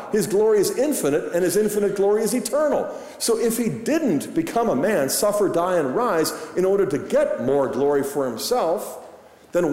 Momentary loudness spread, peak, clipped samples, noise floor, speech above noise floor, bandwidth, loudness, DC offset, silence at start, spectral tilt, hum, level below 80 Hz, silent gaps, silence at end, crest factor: 5 LU; -10 dBFS; under 0.1%; -45 dBFS; 25 dB; 16 kHz; -21 LUFS; under 0.1%; 0 s; -4.5 dB/octave; none; -56 dBFS; none; 0 s; 12 dB